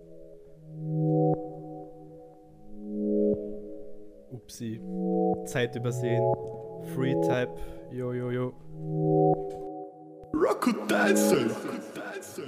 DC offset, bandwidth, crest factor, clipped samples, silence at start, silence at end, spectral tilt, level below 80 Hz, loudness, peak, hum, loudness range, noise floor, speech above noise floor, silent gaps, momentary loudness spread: under 0.1%; 15.5 kHz; 18 dB; under 0.1%; 0 s; 0 s; -6 dB/octave; -56 dBFS; -29 LUFS; -10 dBFS; none; 6 LU; -50 dBFS; 22 dB; none; 20 LU